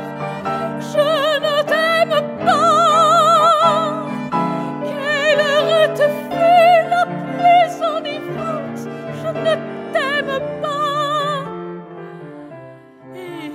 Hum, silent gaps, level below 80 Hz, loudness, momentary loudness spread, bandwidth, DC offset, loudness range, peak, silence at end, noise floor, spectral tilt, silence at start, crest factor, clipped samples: none; none; -62 dBFS; -16 LUFS; 17 LU; 15.5 kHz; under 0.1%; 8 LU; -2 dBFS; 0 s; -39 dBFS; -4.5 dB/octave; 0 s; 16 dB; under 0.1%